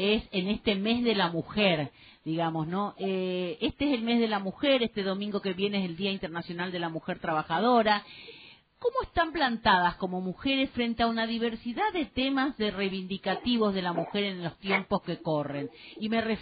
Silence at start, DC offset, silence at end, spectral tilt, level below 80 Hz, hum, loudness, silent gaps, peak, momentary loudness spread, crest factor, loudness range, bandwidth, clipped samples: 0 s; under 0.1%; 0 s; -3 dB/octave; -56 dBFS; none; -29 LUFS; none; -8 dBFS; 8 LU; 20 dB; 2 LU; 4.9 kHz; under 0.1%